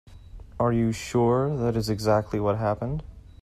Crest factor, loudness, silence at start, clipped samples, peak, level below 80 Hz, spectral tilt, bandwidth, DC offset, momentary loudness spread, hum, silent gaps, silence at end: 16 dB; -25 LUFS; 0.05 s; under 0.1%; -10 dBFS; -44 dBFS; -7 dB/octave; 14 kHz; under 0.1%; 8 LU; none; none; 0.15 s